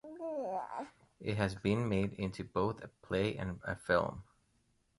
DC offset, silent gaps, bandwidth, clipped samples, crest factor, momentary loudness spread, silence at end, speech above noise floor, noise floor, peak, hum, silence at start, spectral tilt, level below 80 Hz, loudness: under 0.1%; none; 11.5 kHz; under 0.1%; 20 dB; 11 LU; 0.75 s; 39 dB; -75 dBFS; -16 dBFS; none; 0.05 s; -7 dB/octave; -58 dBFS; -37 LUFS